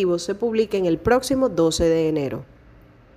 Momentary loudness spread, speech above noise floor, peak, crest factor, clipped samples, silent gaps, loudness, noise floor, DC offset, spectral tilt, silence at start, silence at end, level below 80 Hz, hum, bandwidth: 6 LU; 29 dB; -6 dBFS; 16 dB; under 0.1%; none; -21 LUFS; -49 dBFS; under 0.1%; -5.5 dB/octave; 0 s; 0.7 s; -42 dBFS; none; 15.5 kHz